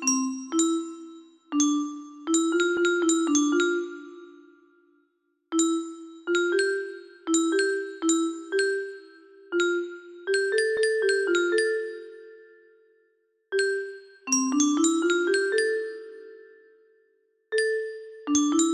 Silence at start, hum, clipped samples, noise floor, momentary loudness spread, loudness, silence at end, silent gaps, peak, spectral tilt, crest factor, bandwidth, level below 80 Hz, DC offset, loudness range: 0 s; none; under 0.1%; -72 dBFS; 16 LU; -25 LUFS; 0 s; none; -10 dBFS; -0.5 dB/octave; 16 dB; 15 kHz; -74 dBFS; under 0.1%; 4 LU